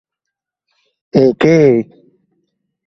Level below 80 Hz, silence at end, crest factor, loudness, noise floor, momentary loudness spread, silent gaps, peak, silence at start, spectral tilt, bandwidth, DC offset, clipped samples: -52 dBFS; 1.05 s; 16 dB; -12 LUFS; -81 dBFS; 8 LU; none; 0 dBFS; 1.15 s; -7.5 dB/octave; 7.8 kHz; under 0.1%; under 0.1%